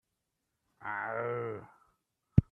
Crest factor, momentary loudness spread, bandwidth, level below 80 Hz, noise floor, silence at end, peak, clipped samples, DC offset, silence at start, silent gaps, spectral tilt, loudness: 28 dB; 15 LU; 3.5 kHz; -48 dBFS; -84 dBFS; 0.1 s; -8 dBFS; under 0.1%; under 0.1%; 0.8 s; none; -11 dB/octave; -35 LUFS